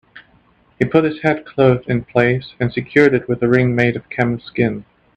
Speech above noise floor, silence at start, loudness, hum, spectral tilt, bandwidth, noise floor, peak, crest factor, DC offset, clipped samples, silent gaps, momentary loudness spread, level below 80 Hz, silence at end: 38 dB; 0.15 s; -17 LUFS; none; -8.5 dB/octave; 8.2 kHz; -54 dBFS; 0 dBFS; 16 dB; under 0.1%; under 0.1%; none; 7 LU; -48 dBFS; 0.35 s